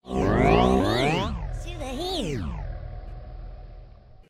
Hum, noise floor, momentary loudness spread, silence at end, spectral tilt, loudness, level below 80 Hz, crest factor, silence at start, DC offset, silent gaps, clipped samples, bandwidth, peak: none; -47 dBFS; 22 LU; 0.1 s; -6 dB/octave; -24 LUFS; -34 dBFS; 20 dB; 0.05 s; under 0.1%; none; under 0.1%; 15 kHz; -6 dBFS